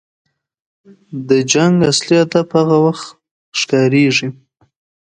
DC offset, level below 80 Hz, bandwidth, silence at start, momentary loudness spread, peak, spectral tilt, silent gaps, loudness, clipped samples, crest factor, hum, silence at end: under 0.1%; -56 dBFS; 9.6 kHz; 1.1 s; 16 LU; 0 dBFS; -5 dB/octave; 3.31-3.52 s; -13 LUFS; under 0.1%; 16 dB; none; 0.75 s